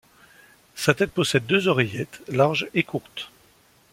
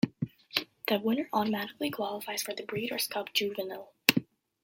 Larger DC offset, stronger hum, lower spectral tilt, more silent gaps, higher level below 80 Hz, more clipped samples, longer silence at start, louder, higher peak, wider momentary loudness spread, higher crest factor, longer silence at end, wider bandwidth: neither; neither; first, -5 dB/octave vs -3.5 dB/octave; neither; first, -60 dBFS vs -72 dBFS; neither; first, 0.75 s vs 0.05 s; first, -23 LUFS vs -31 LUFS; second, -4 dBFS vs 0 dBFS; first, 16 LU vs 9 LU; second, 22 dB vs 32 dB; first, 0.65 s vs 0.4 s; about the same, 16.5 kHz vs 16.5 kHz